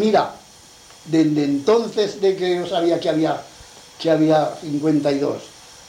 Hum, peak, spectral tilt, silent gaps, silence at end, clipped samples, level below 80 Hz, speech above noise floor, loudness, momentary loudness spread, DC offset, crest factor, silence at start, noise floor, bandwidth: none; -4 dBFS; -6 dB/octave; none; 0.4 s; under 0.1%; -60 dBFS; 27 dB; -20 LUFS; 9 LU; under 0.1%; 16 dB; 0 s; -46 dBFS; 12 kHz